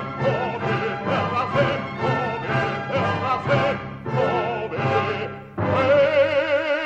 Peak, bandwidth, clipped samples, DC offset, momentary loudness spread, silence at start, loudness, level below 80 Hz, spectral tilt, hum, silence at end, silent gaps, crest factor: -8 dBFS; 8 kHz; under 0.1%; under 0.1%; 7 LU; 0 s; -22 LUFS; -52 dBFS; -7 dB/octave; none; 0 s; none; 14 dB